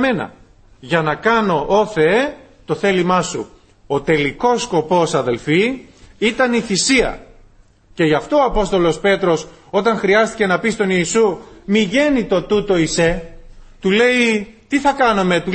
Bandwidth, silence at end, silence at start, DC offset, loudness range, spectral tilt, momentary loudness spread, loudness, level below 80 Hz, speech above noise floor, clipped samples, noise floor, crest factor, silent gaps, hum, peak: 8.8 kHz; 0 s; 0 s; under 0.1%; 2 LU; -4.5 dB/octave; 8 LU; -16 LUFS; -38 dBFS; 32 dB; under 0.1%; -48 dBFS; 16 dB; none; none; -2 dBFS